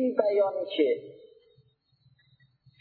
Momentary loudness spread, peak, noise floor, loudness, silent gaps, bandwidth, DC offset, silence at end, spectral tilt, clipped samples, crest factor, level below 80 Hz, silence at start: 9 LU; -8 dBFS; -67 dBFS; -27 LUFS; none; 4.6 kHz; under 0.1%; 1.65 s; -8 dB/octave; under 0.1%; 22 dB; -84 dBFS; 0 s